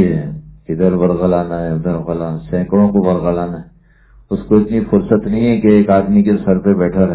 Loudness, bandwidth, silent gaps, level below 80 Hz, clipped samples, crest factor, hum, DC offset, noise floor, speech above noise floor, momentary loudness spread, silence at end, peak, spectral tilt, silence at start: -14 LUFS; 4 kHz; none; -36 dBFS; under 0.1%; 14 dB; none; under 0.1%; -46 dBFS; 33 dB; 12 LU; 0 s; 0 dBFS; -13 dB/octave; 0 s